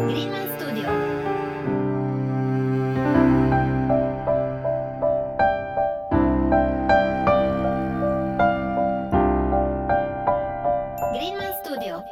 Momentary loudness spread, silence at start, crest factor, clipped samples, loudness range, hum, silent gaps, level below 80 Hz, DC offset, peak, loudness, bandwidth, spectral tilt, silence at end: 7 LU; 0 s; 18 dB; under 0.1%; 2 LU; none; none; -36 dBFS; under 0.1%; -4 dBFS; -23 LUFS; 17 kHz; -7.5 dB/octave; 0 s